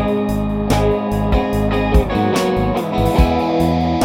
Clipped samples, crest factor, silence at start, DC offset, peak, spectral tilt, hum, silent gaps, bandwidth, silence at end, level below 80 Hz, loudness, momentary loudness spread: under 0.1%; 16 dB; 0 s; under 0.1%; 0 dBFS; -7 dB/octave; none; none; 16.5 kHz; 0 s; -22 dBFS; -17 LUFS; 3 LU